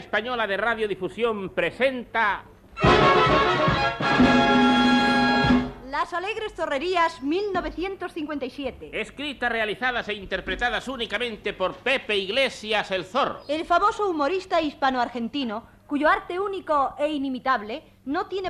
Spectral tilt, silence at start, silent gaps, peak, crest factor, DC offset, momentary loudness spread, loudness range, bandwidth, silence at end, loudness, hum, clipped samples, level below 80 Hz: -5.5 dB/octave; 0 s; none; -6 dBFS; 18 dB; under 0.1%; 13 LU; 8 LU; 12 kHz; 0 s; -23 LUFS; none; under 0.1%; -44 dBFS